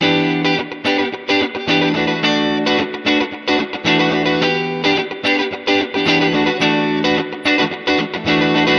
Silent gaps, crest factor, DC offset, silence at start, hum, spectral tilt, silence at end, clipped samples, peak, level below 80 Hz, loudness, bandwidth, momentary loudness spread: none; 14 dB; under 0.1%; 0 s; none; -5 dB/octave; 0 s; under 0.1%; -2 dBFS; -52 dBFS; -16 LUFS; 10 kHz; 3 LU